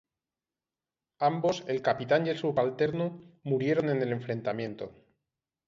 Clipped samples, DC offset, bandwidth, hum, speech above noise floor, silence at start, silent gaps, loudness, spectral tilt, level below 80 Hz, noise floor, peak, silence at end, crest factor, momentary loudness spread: under 0.1%; under 0.1%; 7.6 kHz; none; over 61 dB; 1.2 s; none; -30 LUFS; -7 dB/octave; -70 dBFS; under -90 dBFS; -12 dBFS; 0.75 s; 18 dB; 9 LU